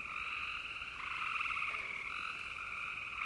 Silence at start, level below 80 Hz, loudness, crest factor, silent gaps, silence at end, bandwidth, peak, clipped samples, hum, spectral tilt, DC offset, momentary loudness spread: 0 s; -66 dBFS; -39 LUFS; 18 dB; none; 0 s; 11.5 kHz; -24 dBFS; under 0.1%; none; -1.5 dB/octave; under 0.1%; 5 LU